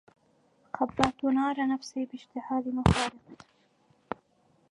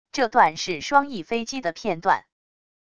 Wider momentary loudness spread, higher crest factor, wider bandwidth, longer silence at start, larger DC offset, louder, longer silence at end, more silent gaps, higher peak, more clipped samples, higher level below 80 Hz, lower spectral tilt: first, 16 LU vs 9 LU; first, 28 dB vs 20 dB; about the same, 11.5 kHz vs 10.5 kHz; first, 0.75 s vs 0.15 s; second, under 0.1% vs 0.4%; second, -29 LUFS vs -23 LUFS; first, 1.35 s vs 0.75 s; neither; about the same, -4 dBFS vs -4 dBFS; neither; first, -46 dBFS vs -60 dBFS; first, -6 dB/octave vs -3.5 dB/octave